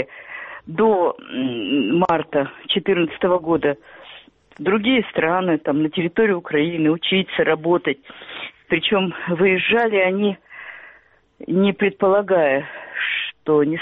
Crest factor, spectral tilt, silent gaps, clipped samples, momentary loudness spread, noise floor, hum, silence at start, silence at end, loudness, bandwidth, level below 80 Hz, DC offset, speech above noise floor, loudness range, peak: 18 dB; -3.5 dB/octave; none; under 0.1%; 15 LU; -52 dBFS; none; 0 s; 0 s; -19 LUFS; 4.1 kHz; -58 dBFS; under 0.1%; 33 dB; 2 LU; -2 dBFS